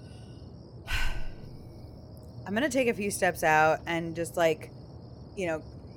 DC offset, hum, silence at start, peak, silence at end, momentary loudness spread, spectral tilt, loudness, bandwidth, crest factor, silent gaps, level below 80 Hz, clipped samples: under 0.1%; none; 0 s; -12 dBFS; 0 s; 23 LU; -4.5 dB/octave; -28 LUFS; 19 kHz; 20 dB; none; -42 dBFS; under 0.1%